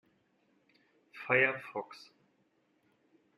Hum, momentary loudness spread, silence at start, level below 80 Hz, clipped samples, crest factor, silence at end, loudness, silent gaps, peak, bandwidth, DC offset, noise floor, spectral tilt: none; 22 LU; 1.15 s; -84 dBFS; under 0.1%; 24 dB; 1.4 s; -31 LUFS; none; -14 dBFS; 12.5 kHz; under 0.1%; -74 dBFS; -6 dB/octave